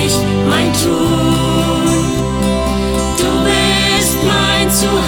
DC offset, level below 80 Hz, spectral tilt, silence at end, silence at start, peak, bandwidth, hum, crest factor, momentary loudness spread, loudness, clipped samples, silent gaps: under 0.1%; -26 dBFS; -4 dB/octave; 0 s; 0 s; -2 dBFS; 20 kHz; none; 12 dB; 4 LU; -13 LUFS; under 0.1%; none